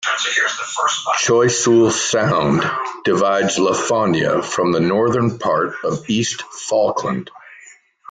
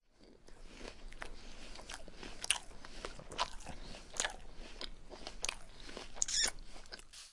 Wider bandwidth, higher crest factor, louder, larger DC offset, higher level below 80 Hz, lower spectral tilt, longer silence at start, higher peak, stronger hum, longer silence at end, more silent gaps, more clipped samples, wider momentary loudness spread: second, 9.6 kHz vs 11.5 kHz; second, 14 dB vs 34 dB; first, -17 LUFS vs -40 LUFS; neither; about the same, -54 dBFS vs -52 dBFS; first, -4 dB/octave vs 0 dB/octave; second, 0 s vs 0.2 s; first, -4 dBFS vs -10 dBFS; neither; first, 0.55 s vs 0 s; neither; neither; second, 7 LU vs 18 LU